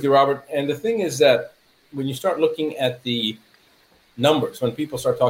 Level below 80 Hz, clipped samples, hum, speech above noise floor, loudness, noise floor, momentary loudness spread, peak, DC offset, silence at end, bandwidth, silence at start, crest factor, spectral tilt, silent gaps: -62 dBFS; under 0.1%; none; 37 dB; -21 LUFS; -57 dBFS; 11 LU; -4 dBFS; under 0.1%; 0 s; 16 kHz; 0 s; 18 dB; -5 dB/octave; none